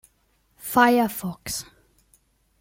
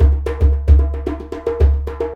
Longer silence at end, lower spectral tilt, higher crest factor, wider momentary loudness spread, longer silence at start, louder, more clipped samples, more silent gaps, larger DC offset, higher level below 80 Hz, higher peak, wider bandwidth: first, 1 s vs 0 s; second, -4 dB/octave vs -9.5 dB/octave; first, 22 dB vs 14 dB; first, 14 LU vs 10 LU; first, 0.65 s vs 0 s; second, -22 LUFS vs -17 LUFS; neither; neither; neither; second, -56 dBFS vs -16 dBFS; second, -4 dBFS vs 0 dBFS; first, 17 kHz vs 4 kHz